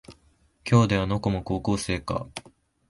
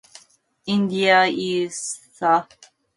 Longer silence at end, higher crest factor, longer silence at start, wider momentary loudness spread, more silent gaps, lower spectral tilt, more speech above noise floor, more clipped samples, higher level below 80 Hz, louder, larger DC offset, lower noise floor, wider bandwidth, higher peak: about the same, 0.5 s vs 0.5 s; about the same, 20 dB vs 20 dB; second, 0.1 s vs 0.65 s; first, 18 LU vs 13 LU; neither; first, -6.5 dB/octave vs -4 dB/octave; about the same, 38 dB vs 36 dB; neither; first, -44 dBFS vs -68 dBFS; second, -25 LUFS vs -20 LUFS; neither; first, -62 dBFS vs -57 dBFS; about the same, 11.5 kHz vs 11.5 kHz; second, -8 dBFS vs -4 dBFS